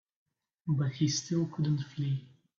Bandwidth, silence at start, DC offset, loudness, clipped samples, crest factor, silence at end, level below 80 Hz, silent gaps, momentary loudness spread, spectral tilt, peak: 7.6 kHz; 0.65 s; under 0.1%; -32 LUFS; under 0.1%; 16 dB; 0.3 s; -68 dBFS; none; 6 LU; -5.5 dB/octave; -18 dBFS